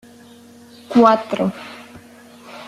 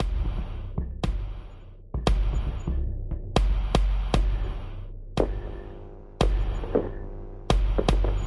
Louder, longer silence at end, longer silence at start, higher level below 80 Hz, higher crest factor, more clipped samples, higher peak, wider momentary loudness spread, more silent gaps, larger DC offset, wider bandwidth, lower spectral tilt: first, -16 LUFS vs -29 LUFS; about the same, 0.05 s vs 0 s; first, 0.9 s vs 0 s; second, -62 dBFS vs -28 dBFS; about the same, 18 dB vs 20 dB; neither; first, -2 dBFS vs -6 dBFS; first, 25 LU vs 15 LU; neither; neither; first, 13 kHz vs 11.5 kHz; about the same, -6.5 dB/octave vs -6.5 dB/octave